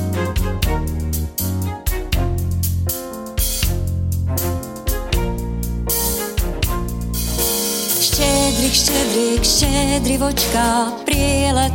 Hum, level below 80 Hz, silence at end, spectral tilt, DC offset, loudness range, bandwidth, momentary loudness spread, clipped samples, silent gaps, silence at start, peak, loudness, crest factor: none; -24 dBFS; 0 s; -4 dB/octave; under 0.1%; 6 LU; 17 kHz; 9 LU; under 0.1%; none; 0 s; -2 dBFS; -18 LUFS; 16 dB